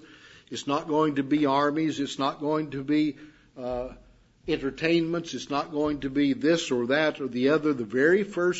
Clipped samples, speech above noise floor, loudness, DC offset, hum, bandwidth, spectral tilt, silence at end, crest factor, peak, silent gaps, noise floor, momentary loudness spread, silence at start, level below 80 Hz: under 0.1%; 26 dB; -26 LUFS; under 0.1%; none; 8 kHz; -5.5 dB/octave; 0 s; 18 dB; -10 dBFS; none; -51 dBFS; 10 LU; 0.1 s; -56 dBFS